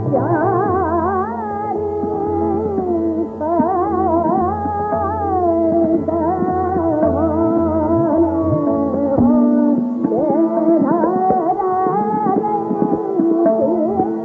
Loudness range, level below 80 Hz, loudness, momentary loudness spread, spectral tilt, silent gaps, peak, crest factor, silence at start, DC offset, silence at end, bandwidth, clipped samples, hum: 3 LU; -48 dBFS; -17 LUFS; 5 LU; -10.5 dB/octave; none; -2 dBFS; 14 dB; 0 s; under 0.1%; 0 s; 2.4 kHz; under 0.1%; none